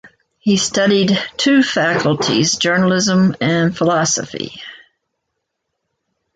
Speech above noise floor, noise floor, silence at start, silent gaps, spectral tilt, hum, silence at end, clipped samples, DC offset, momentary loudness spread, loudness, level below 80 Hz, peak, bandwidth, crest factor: 60 dB; -75 dBFS; 0.05 s; none; -4 dB/octave; none; 1.6 s; under 0.1%; under 0.1%; 11 LU; -15 LUFS; -54 dBFS; -2 dBFS; 9.4 kHz; 14 dB